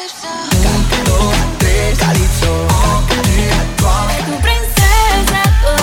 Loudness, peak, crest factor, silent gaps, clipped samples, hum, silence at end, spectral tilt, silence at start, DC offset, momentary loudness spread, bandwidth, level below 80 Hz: -13 LUFS; 0 dBFS; 12 dB; none; under 0.1%; none; 0 s; -4 dB/octave; 0 s; under 0.1%; 4 LU; 18 kHz; -16 dBFS